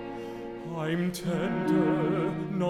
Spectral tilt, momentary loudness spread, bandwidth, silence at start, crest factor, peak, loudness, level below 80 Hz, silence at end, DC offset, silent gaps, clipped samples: -7 dB/octave; 13 LU; 15.5 kHz; 0 s; 16 dB; -12 dBFS; -29 LUFS; -58 dBFS; 0 s; under 0.1%; none; under 0.1%